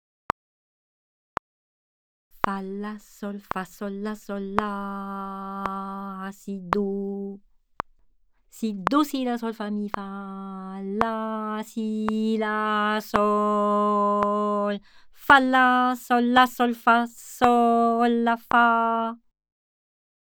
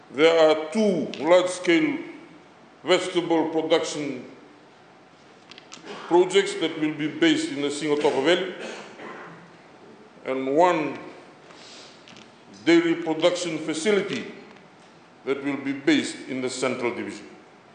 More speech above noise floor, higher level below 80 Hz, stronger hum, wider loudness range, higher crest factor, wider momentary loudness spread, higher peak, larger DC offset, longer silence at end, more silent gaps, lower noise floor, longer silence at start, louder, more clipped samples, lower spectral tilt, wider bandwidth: first, 36 dB vs 29 dB; first, -58 dBFS vs -80 dBFS; neither; first, 11 LU vs 5 LU; about the same, 24 dB vs 20 dB; second, 17 LU vs 21 LU; first, 0 dBFS vs -6 dBFS; neither; first, 1.1 s vs 0.35 s; neither; first, -60 dBFS vs -51 dBFS; first, 2.45 s vs 0.1 s; about the same, -24 LUFS vs -23 LUFS; neither; first, -5.5 dB/octave vs -4 dB/octave; first, over 20 kHz vs 9.6 kHz